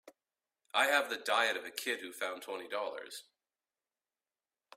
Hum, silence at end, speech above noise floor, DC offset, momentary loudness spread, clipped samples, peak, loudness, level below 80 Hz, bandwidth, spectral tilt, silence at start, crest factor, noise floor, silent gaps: none; 1.55 s; over 55 dB; under 0.1%; 14 LU; under 0.1%; -14 dBFS; -34 LUFS; -88 dBFS; 16 kHz; 0 dB/octave; 0.05 s; 24 dB; under -90 dBFS; none